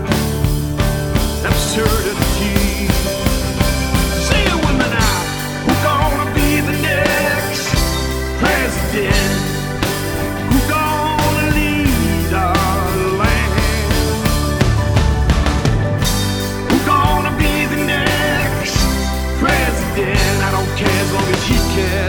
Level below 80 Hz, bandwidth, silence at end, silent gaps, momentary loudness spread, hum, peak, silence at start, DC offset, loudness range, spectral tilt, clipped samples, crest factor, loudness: -22 dBFS; over 20 kHz; 0 s; none; 3 LU; none; 0 dBFS; 0 s; under 0.1%; 1 LU; -4.5 dB/octave; under 0.1%; 16 dB; -16 LUFS